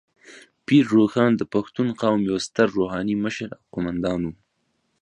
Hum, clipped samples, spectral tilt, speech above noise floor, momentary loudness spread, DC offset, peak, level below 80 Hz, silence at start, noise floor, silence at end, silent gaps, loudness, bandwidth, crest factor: none; under 0.1%; -6.5 dB/octave; 50 dB; 12 LU; under 0.1%; -4 dBFS; -54 dBFS; 0.3 s; -71 dBFS; 0.7 s; none; -22 LUFS; 10.5 kHz; 18 dB